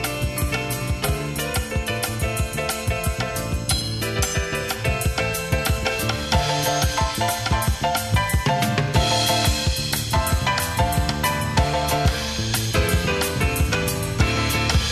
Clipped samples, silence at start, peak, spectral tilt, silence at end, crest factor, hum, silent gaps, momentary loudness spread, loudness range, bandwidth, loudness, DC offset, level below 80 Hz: under 0.1%; 0 s; -4 dBFS; -4 dB/octave; 0 s; 18 dB; none; none; 5 LU; 3 LU; 14 kHz; -22 LUFS; under 0.1%; -30 dBFS